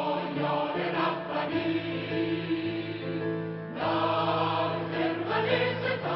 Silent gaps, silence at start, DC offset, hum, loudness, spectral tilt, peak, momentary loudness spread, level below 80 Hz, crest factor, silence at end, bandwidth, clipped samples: none; 0 s; under 0.1%; none; -29 LUFS; -4 dB/octave; -12 dBFS; 6 LU; -66 dBFS; 16 dB; 0 s; 5.8 kHz; under 0.1%